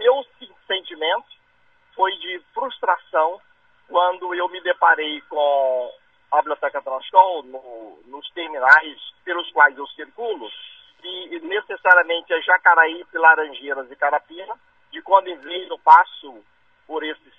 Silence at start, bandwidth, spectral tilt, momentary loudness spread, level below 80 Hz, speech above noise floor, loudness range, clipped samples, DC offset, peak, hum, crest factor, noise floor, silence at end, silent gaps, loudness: 0 s; 7.4 kHz; -2.5 dB/octave; 21 LU; -72 dBFS; 42 dB; 6 LU; under 0.1%; under 0.1%; 0 dBFS; none; 20 dB; -61 dBFS; 0.25 s; none; -19 LUFS